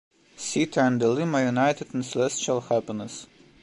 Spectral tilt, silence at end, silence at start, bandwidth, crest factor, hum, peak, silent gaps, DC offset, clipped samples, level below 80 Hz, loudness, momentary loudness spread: -5 dB/octave; 0.4 s; 0.4 s; 11.5 kHz; 16 dB; none; -10 dBFS; none; under 0.1%; under 0.1%; -68 dBFS; -25 LUFS; 12 LU